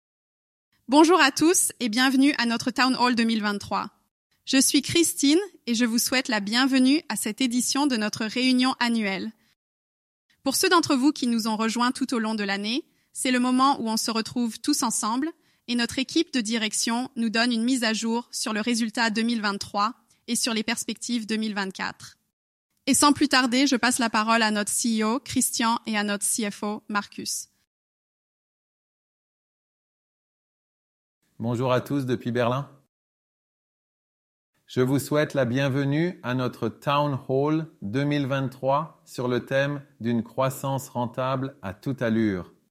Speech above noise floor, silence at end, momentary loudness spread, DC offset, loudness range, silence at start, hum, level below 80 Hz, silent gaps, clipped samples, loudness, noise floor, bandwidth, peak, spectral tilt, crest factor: over 66 dB; 0.25 s; 10 LU; under 0.1%; 7 LU; 0.9 s; none; -66 dBFS; 4.11-4.30 s, 9.56-10.29 s, 22.33-22.70 s, 27.67-31.21 s, 32.89-34.53 s; under 0.1%; -24 LUFS; under -90 dBFS; 15.5 kHz; -4 dBFS; -3.5 dB/octave; 20 dB